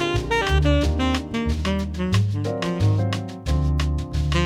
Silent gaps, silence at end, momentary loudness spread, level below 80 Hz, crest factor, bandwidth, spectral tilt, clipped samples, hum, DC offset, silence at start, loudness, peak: none; 0 s; 6 LU; -26 dBFS; 16 dB; 12 kHz; -6 dB/octave; under 0.1%; none; under 0.1%; 0 s; -23 LUFS; -6 dBFS